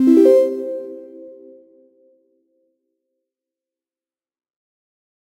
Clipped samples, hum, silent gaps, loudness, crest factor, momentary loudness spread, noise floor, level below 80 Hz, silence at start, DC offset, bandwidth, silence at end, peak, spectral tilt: under 0.1%; none; none; -15 LUFS; 18 dB; 27 LU; under -90 dBFS; -80 dBFS; 0 s; under 0.1%; 15 kHz; 4 s; -2 dBFS; -6.5 dB/octave